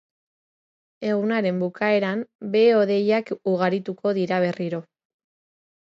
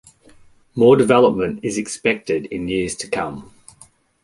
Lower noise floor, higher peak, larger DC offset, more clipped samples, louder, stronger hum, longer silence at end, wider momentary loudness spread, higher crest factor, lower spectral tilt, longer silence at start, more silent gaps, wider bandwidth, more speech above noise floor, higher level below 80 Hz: first, under -90 dBFS vs -51 dBFS; second, -8 dBFS vs 0 dBFS; neither; neither; second, -23 LUFS vs -18 LUFS; neither; first, 1.05 s vs 0.8 s; about the same, 11 LU vs 12 LU; about the same, 16 dB vs 18 dB; first, -7.5 dB/octave vs -5 dB/octave; first, 1 s vs 0.75 s; first, 2.35-2.39 s vs none; second, 7.6 kHz vs 11.5 kHz; first, over 68 dB vs 33 dB; second, -74 dBFS vs -50 dBFS